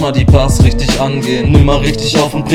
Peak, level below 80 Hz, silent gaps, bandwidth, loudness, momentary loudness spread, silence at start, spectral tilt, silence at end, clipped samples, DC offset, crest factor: 0 dBFS; -16 dBFS; none; 14.5 kHz; -11 LUFS; 5 LU; 0 s; -6 dB/octave; 0 s; 0.9%; under 0.1%; 10 dB